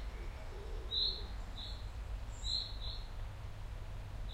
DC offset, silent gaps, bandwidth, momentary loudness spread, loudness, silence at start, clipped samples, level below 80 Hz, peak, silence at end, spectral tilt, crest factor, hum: under 0.1%; none; 15 kHz; 14 LU; -42 LUFS; 0 s; under 0.1%; -44 dBFS; -22 dBFS; 0 s; -3.5 dB/octave; 18 dB; none